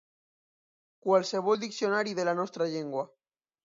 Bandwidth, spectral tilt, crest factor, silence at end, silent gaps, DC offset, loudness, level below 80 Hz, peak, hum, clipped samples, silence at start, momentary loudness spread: 7.6 kHz; -4.5 dB/octave; 18 dB; 0.75 s; none; under 0.1%; -30 LUFS; -82 dBFS; -12 dBFS; none; under 0.1%; 1.05 s; 10 LU